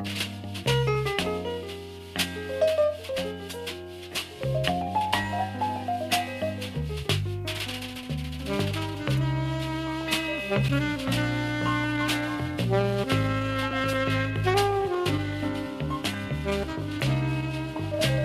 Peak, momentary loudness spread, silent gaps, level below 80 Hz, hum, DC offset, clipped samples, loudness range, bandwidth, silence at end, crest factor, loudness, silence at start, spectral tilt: -8 dBFS; 8 LU; none; -44 dBFS; none; under 0.1%; under 0.1%; 4 LU; 15 kHz; 0 s; 20 dB; -28 LUFS; 0 s; -5.5 dB/octave